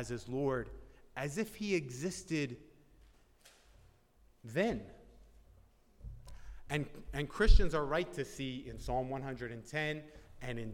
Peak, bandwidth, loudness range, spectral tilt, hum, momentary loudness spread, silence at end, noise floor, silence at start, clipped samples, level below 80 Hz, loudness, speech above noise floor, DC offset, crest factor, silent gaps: -12 dBFS; 15 kHz; 7 LU; -5.5 dB/octave; none; 21 LU; 0 s; -66 dBFS; 0 s; under 0.1%; -40 dBFS; -37 LUFS; 33 dB; under 0.1%; 24 dB; none